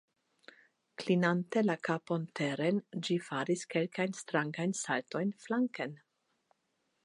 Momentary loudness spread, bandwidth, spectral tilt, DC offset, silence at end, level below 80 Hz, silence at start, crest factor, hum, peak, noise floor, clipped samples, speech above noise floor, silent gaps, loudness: 6 LU; 11.5 kHz; -5.5 dB/octave; under 0.1%; 1.1 s; -86 dBFS; 1 s; 20 dB; none; -14 dBFS; -80 dBFS; under 0.1%; 47 dB; none; -34 LUFS